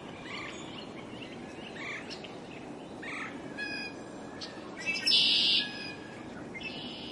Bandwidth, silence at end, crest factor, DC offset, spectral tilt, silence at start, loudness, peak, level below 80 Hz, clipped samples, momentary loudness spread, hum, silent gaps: 11.5 kHz; 0 s; 22 dB; under 0.1%; -2.5 dB/octave; 0 s; -31 LUFS; -14 dBFS; -68 dBFS; under 0.1%; 20 LU; none; none